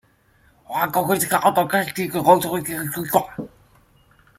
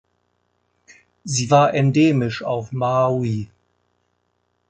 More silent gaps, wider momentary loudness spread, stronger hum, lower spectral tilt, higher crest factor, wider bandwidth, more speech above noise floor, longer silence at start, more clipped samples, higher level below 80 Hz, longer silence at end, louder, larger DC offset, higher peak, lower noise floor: neither; about the same, 13 LU vs 11 LU; second, none vs 60 Hz at -45 dBFS; second, -4.5 dB/octave vs -6 dB/octave; about the same, 20 dB vs 18 dB; first, 16.5 kHz vs 9 kHz; second, 38 dB vs 51 dB; second, 0.7 s vs 1.25 s; neither; about the same, -58 dBFS vs -56 dBFS; second, 0.9 s vs 1.25 s; about the same, -20 LUFS vs -19 LUFS; neither; about the same, -2 dBFS vs -2 dBFS; second, -58 dBFS vs -70 dBFS